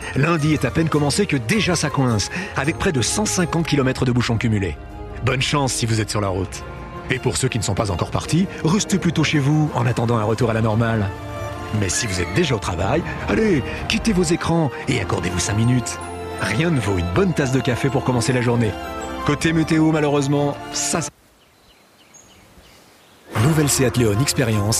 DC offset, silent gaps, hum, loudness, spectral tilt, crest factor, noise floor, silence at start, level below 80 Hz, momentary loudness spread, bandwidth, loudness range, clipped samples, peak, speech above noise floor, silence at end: under 0.1%; none; none; -20 LUFS; -5 dB/octave; 16 dB; -53 dBFS; 0 s; -40 dBFS; 7 LU; 15.5 kHz; 3 LU; under 0.1%; -2 dBFS; 34 dB; 0 s